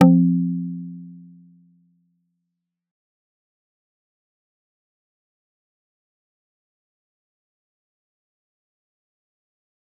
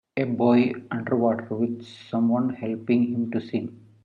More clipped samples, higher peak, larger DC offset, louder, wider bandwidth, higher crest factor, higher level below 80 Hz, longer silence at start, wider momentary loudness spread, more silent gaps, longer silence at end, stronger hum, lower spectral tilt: neither; first, -2 dBFS vs -8 dBFS; neither; first, -20 LUFS vs -25 LUFS; second, 3 kHz vs 5 kHz; first, 26 dB vs 18 dB; second, -76 dBFS vs -70 dBFS; second, 0 s vs 0.15 s; first, 24 LU vs 11 LU; neither; first, 8.85 s vs 0.3 s; neither; about the same, -9.5 dB/octave vs -9 dB/octave